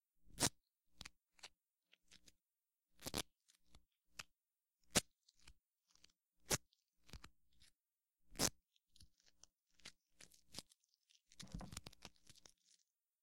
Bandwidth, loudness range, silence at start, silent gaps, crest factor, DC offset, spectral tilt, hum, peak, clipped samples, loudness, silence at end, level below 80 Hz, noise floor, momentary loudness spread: 16 kHz; 12 LU; 0.3 s; none; 36 dB; under 0.1%; -2 dB/octave; none; -16 dBFS; under 0.1%; -44 LUFS; 1.15 s; -68 dBFS; under -90 dBFS; 25 LU